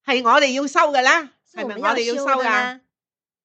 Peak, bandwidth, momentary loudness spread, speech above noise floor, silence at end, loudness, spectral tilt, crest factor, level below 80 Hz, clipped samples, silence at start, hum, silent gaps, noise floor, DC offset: 0 dBFS; 8.8 kHz; 13 LU; over 72 dB; 0.7 s; -18 LUFS; -1.5 dB/octave; 20 dB; -78 dBFS; under 0.1%; 0.05 s; none; none; under -90 dBFS; under 0.1%